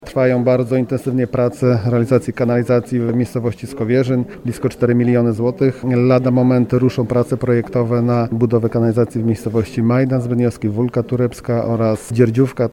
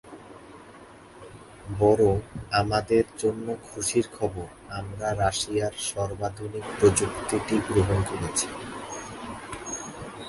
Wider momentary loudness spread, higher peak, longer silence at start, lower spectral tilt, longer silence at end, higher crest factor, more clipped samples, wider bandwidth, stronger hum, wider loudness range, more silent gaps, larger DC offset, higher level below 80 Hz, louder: second, 5 LU vs 23 LU; first, 0 dBFS vs -6 dBFS; about the same, 0 s vs 0.05 s; first, -8.5 dB/octave vs -4.5 dB/octave; about the same, 0 s vs 0 s; about the same, 16 dB vs 20 dB; neither; about the same, 12.5 kHz vs 11.5 kHz; neither; about the same, 2 LU vs 3 LU; neither; neither; about the same, -48 dBFS vs -46 dBFS; first, -17 LUFS vs -27 LUFS